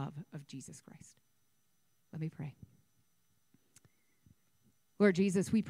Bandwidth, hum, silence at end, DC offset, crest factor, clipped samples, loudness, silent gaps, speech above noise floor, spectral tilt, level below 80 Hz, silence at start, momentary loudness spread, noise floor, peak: 14.5 kHz; none; 0 s; under 0.1%; 22 dB; under 0.1%; -33 LUFS; none; 45 dB; -6.5 dB/octave; -74 dBFS; 0 s; 23 LU; -79 dBFS; -16 dBFS